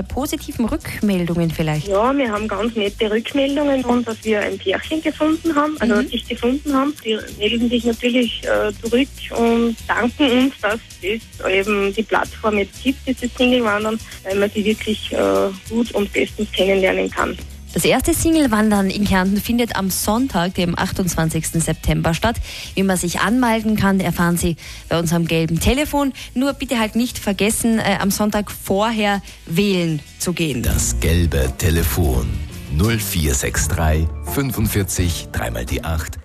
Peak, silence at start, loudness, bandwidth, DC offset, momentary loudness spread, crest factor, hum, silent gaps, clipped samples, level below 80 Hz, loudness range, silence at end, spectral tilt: -4 dBFS; 0 s; -19 LUFS; 14 kHz; under 0.1%; 7 LU; 14 dB; none; none; under 0.1%; -30 dBFS; 2 LU; 0 s; -5 dB/octave